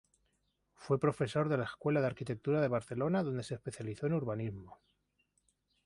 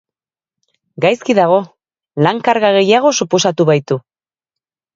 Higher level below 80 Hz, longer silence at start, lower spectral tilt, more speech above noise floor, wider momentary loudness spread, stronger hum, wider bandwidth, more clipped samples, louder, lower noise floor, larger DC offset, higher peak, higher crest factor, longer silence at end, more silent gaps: second, -68 dBFS vs -62 dBFS; second, 0.8 s vs 1 s; first, -7.5 dB/octave vs -4.5 dB/octave; second, 44 dB vs 75 dB; about the same, 9 LU vs 10 LU; first, 50 Hz at -55 dBFS vs none; first, 11.5 kHz vs 7.8 kHz; neither; second, -35 LUFS vs -13 LUFS; second, -79 dBFS vs -88 dBFS; neither; second, -18 dBFS vs 0 dBFS; about the same, 18 dB vs 16 dB; first, 1.1 s vs 0.95 s; neither